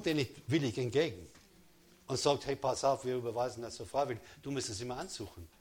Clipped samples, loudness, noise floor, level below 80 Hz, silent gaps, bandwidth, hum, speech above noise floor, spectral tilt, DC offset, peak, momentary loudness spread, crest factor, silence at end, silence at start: under 0.1%; -35 LUFS; -63 dBFS; -64 dBFS; none; 17.5 kHz; none; 28 dB; -4.5 dB/octave; under 0.1%; -14 dBFS; 11 LU; 20 dB; 0.15 s; 0 s